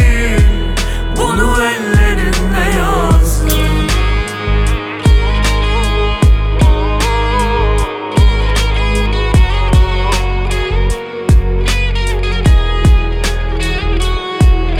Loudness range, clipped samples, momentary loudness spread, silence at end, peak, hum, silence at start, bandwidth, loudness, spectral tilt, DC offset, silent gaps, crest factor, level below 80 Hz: 1 LU; under 0.1%; 5 LU; 0 s; 0 dBFS; none; 0 s; 16.5 kHz; -14 LUFS; -5.5 dB/octave; under 0.1%; none; 10 dB; -12 dBFS